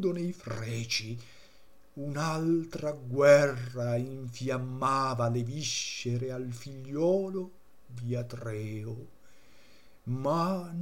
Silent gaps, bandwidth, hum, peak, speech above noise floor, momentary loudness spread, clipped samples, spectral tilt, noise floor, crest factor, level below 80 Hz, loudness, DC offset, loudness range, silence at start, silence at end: none; 16.5 kHz; none; -8 dBFS; 29 dB; 14 LU; under 0.1%; -5.5 dB/octave; -60 dBFS; 24 dB; -66 dBFS; -31 LUFS; 0.3%; 8 LU; 0 s; 0 s